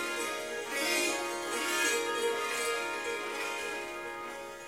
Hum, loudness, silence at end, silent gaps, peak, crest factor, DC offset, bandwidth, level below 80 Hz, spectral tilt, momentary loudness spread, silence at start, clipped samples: none; -32 LUFS; 0 s; none; -18 dBFS; 16 dB; under 0.1%; 16 kHz; -70 dBFS; -0.5 dB/octave; 10 LU; 0 s; under 0.1%